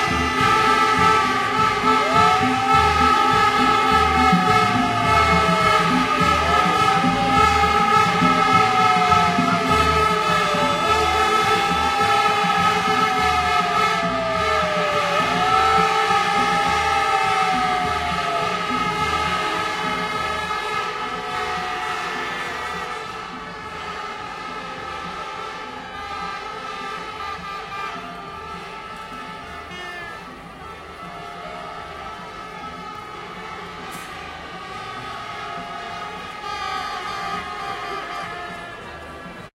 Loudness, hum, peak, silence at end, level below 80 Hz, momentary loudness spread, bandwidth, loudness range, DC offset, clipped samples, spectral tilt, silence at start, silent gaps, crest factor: -19 LUFS; none; -4 dBFS; 0.1 s; -42 dBFS; 17 LU; 16 kHz; 17 LU; under 0.1%; under 0.1%; -4 dB/octave; 0 s; none; 18 dB